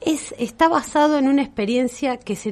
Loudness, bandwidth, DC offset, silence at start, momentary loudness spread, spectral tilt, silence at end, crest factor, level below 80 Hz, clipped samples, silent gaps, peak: -20 LUFS; 13.5 kHz; under 0.1%; 0 s; 8 LU; -4.5 dB/octave; 0 s; 16 dB; -52 dBFS; under 0.1%; none; -2 dBFS